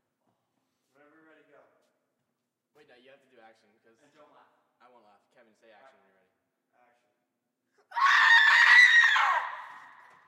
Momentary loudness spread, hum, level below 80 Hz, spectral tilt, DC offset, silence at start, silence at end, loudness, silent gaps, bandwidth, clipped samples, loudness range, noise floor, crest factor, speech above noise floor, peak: 22 LU; none; -82 dBFS; 3 dB/octave; under 0.1%; 7.95 s; 0.65 s; -19 LUFS; none; 14.5 kHz; under 0.1%; 10 LU; -83 dBFS; 20 dB; 23 dB; -8 dBFS